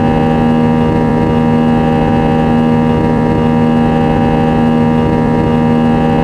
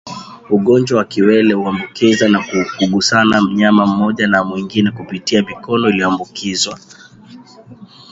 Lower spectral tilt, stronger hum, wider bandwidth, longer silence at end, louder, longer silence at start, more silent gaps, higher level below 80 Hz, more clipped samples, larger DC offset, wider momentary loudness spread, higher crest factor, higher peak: first, -8.5 dB/octave vs -5 dB/octave; neither; about the same, 8.4 kHz vs 8 kHz; second, 0 s vs 0.25 s; first, -11 LUFS vs -14 LUFS; about the same, 0 s vs 0.05 s; neither; first, -26 dBFS vs -50 dBFS; neither; neither; second, 1 LU vs 8 LU; about the same, 10 dB vs 14 dB; about the same, 0 dBFS vs 0 dBFS